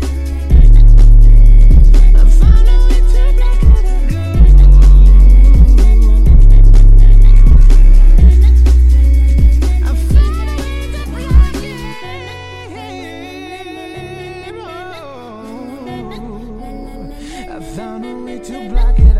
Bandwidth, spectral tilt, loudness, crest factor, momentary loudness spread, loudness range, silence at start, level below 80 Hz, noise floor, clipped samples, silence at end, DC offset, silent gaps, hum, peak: 5.6 kHz; -7.5 dB/octave; -10 LUFS; 6 dB; 20 LU; 19 LU; 0 s; -6 dBFS; -30 dBFS; under 0.1%; 0 s; under 0.1%; none; none; 0 dBFS